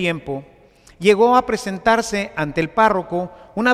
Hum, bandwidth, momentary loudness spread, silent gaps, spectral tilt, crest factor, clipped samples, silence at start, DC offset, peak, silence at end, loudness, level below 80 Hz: none; 14.5 kHz; 13 LU; none; -5 dB/octave; 16 dB; under 0.1%; 0 s; under 0.1%; -2 dBFS; 0 s; -18 LUFS; -48 dBFS